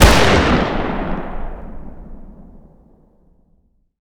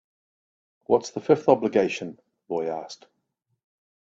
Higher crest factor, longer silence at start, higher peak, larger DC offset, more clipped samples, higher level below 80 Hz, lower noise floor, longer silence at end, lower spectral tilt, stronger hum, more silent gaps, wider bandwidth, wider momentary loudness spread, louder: second, 18 dB vs 24 dB; second, 0 s vs 0.9 s; about the same, 0 dBFS vs -2 dBFS; neither; first, 0.2% vs under 0.1%; first, -24 dBFS vs -68 dBFS; second, -58 dBFS vs -77 dBFS; first, 1.45 s vs 1.15 s; second, -4.5 dB/octave vs -6 dB/octave; neither; neither; first, over 20 kHz vs 7.8 kHz; first, 26 LU vs 18 LU; first, -16 LUFS vs -24 LUFS